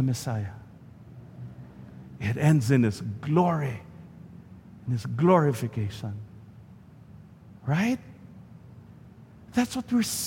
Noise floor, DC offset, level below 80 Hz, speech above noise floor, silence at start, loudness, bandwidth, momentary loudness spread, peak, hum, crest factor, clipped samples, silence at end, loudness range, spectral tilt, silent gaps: -49 dBFS; under 0.1%; -58 dBFS; 24 dB; 0 s; -26 LUFS; 16.5 kHz; 26 LU; -6 dBFS; none; 22 dB; under 0.1%; 0 s; 8 LU; -6.5 dB/octave; none